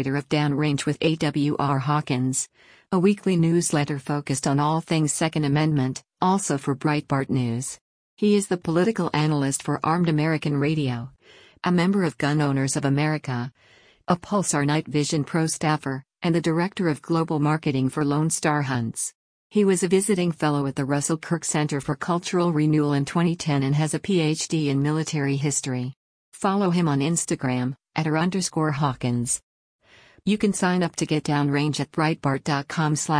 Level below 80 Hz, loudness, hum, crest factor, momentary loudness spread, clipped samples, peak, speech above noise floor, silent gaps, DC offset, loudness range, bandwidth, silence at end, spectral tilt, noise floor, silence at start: -58 dBFS; -23 LUFS; none; 16 dB; 6 LU; under 0.1%; -8 dBFS; 21 dB; 7.81-8.17 s, 19.15-19.50 s, 25.96-26.32 s, 29.43-29.79 s; under 0.1%; 2 LU; 10.5 kHz; 0 s; -5.5 dB/octave; -44 dBFS; 0 s